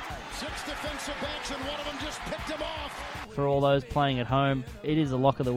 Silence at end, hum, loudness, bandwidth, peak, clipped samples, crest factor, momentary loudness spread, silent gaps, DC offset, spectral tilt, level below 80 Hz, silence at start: 0 s; none; -30 LUFS; 15.5 kHz; -10 dBFS; under 0.1%; 20 dB; 11 LU; none; under 0.1%; -5.5 dB/octave; -46 dBFS; 0 s